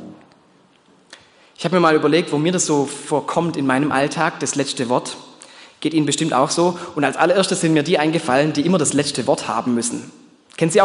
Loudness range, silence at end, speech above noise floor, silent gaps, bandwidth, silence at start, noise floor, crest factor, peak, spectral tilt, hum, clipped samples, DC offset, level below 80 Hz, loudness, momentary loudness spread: 3 LU; 0 s; 36 dB; none; 11 kHz; 0 s; -54 dBFS; 18 dB; 0 dBFS; -4.5 dB/octave; none; under 0.1%; under 0.1%; -64 dBFS; -18 LUFS; 6 LU